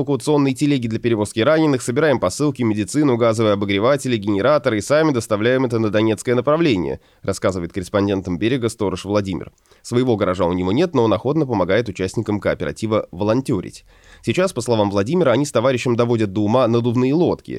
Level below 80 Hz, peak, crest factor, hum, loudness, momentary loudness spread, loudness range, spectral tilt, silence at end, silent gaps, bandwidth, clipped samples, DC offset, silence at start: -50 dBFS; -4 dBFS; 14 dB; none; -19 LUFS; 6 LU; 4 LU; -6 dB/octave; 0 s; none; 14 kHz; under 0.1%; under 0.1%; 0 s